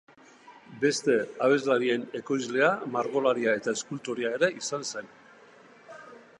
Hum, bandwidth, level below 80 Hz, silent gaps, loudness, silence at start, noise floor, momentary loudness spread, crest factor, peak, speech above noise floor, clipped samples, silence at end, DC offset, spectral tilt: none; 11 kHz; -80 dBFS; none; -27 LUFS; 0.45 s; -54 dBFS; 11 LU; 20 dB; -10 dBFS; 27 dB; under 0.1%; 0.2 s; under 0.1%; -4 dB/octave